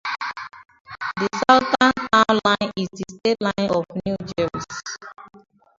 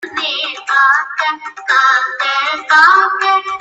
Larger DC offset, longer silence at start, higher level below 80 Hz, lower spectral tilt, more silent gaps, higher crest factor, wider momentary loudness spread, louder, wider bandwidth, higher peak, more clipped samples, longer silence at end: neither; about the same, 0.05 s vs 0 s; first, -54 dBFS vs -66 dBFS; first, -4.5 dB/octave vs 0.5 dB/octave; first, 0.80-0.85 s vs none; first, 22 dB vs 14 dB; first, 18 LU vs 10 LU; second, -21 LUFS vs -12 LUFS; second, 7.8 kHz vs 10 kHz; about the same, 0 dBFS vs 0 dBFS; neither; first, 0.4 s vs 0 s